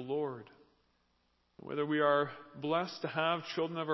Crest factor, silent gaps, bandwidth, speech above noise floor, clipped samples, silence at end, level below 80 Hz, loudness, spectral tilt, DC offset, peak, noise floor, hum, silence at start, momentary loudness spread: 20 dB; none; 6.2 kHz; 41 dB; under 0.1%; 0 s; -80 dBFS; -34 LUFS; -6.5 dB/octave; under 0.1%; -16 dBFS; -75 dBFS; none; 0 s; 13 LU